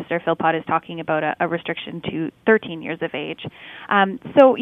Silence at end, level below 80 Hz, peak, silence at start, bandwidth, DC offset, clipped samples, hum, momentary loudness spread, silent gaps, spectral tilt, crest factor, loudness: 0 s; -64 dBFS; 0 dBFS; 0 s; 4.2 kHz; under 0.1%; under 0.1%; none; 11 LU; none; -8 dB/octave; 20 dB; -21 LUFS